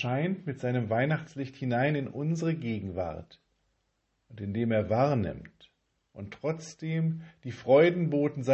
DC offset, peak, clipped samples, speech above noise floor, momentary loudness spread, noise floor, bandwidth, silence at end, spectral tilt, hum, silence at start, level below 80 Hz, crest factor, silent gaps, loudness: under 0.1%; -10 dBFS; under 0.1%; 48 dB; 15 LU; -77 dBFS; 8.4 kHz; 0 s; -7.5 dB/octave; none; 0 s; -56 dBFS; 20 dB; none; -29 LUFS